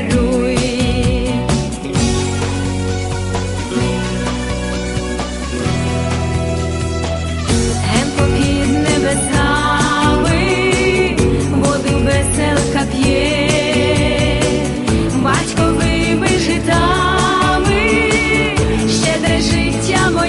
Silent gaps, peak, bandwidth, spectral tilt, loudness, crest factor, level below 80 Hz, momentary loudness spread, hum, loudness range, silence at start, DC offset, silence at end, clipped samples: none; -2 dBFS; 11.5 kHz; -5 dB/octave; -15 LUFS; 14 dB; -24 dBFS; 6 LU; none; 5 LU; 0 s; under 0.1%; 0 s; under 0.1%